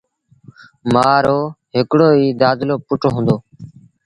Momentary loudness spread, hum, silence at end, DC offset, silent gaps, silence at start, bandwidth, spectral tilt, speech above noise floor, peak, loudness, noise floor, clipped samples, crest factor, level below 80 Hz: 8 LU; none; 0.35 s; under 0.1%; none; 0.85 s; 11 kHz; -7.5 dB/octave; 31 dB; 0 dBFS; -15 LUFS; -46 dBFS; under 0.1%; 16 dB; -50 dBFS